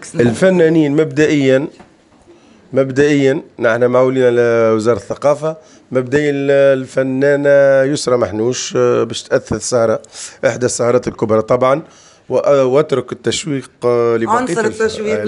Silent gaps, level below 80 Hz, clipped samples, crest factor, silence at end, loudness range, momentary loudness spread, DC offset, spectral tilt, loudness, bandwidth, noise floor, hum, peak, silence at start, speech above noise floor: none; -52 dBFS; under 0.1%; 14 dB; 0 s; 2 LU; 7 LU; under 0.1%; -5.5 dB/octave; -14 LUFS; 11 kHz; -46 dBFS; none; 0 dBFS; 0 s; 32 dB